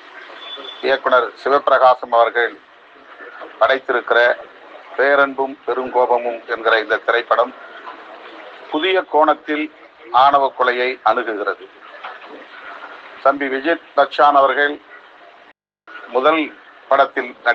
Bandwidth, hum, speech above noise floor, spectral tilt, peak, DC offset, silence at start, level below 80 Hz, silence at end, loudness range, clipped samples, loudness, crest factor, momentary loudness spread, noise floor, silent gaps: 7 kHz; none; 34 dB; -4.5 dB/octave; 0 dBFS; under 0.1%; 0.15 s; -70 dBFS; 0 s; 3 LU; under 0.1%; -16 LUFS; 18 dB; 22 LU; -50 dBFS; none